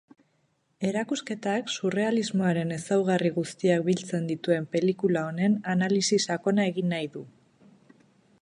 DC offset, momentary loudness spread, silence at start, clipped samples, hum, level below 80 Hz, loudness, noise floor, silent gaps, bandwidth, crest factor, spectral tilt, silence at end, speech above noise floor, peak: under 0.1%; 6 LU; 0.8 s; under 0.1%; none; -72 dBFS; -27 LUFS; -71 dBFS; none; 11.5 kHz; 18 dB; -5.5 dB/octave; 1.1 s; 45 dB; -10 dBFS